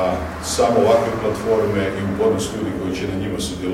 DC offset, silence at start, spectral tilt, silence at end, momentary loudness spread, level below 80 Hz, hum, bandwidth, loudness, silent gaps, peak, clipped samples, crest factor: under 0.1%; 0 s; -5 dB/octave; 0 s; 8 LU; -40 dBFS; none; 16 kHz; -20 LUFS; none; -2 dBFS; under 0.1%; 16 dB